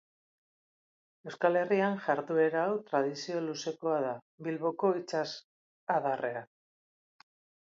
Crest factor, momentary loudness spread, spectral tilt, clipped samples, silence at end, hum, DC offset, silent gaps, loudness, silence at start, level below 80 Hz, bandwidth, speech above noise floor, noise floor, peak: 20 dB; 11 LU; -5.5 dB/octave; under 0.1%; 1.3 s; none; under 0.1%; 4.22-4.38 s, 5.44-5.87 s; -32 LUFS; 1.25 s; -86 dBFS; 7.6 kHz; over 59 dB; under -90 dBFS; -14 dBFS